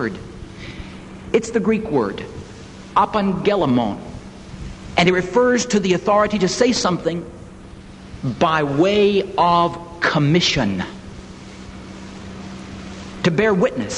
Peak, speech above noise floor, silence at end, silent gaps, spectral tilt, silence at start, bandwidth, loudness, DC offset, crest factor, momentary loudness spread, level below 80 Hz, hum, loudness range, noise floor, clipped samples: -2 dBFS; 21 dB; 0 s; none; -5 dB/octave; 0 s; 11 kHz; -18 LUFS; under 0.1%; 18 dB; 21 LU; -42 dBFS; none; 5 LU; -38 dBFS; under 0.1%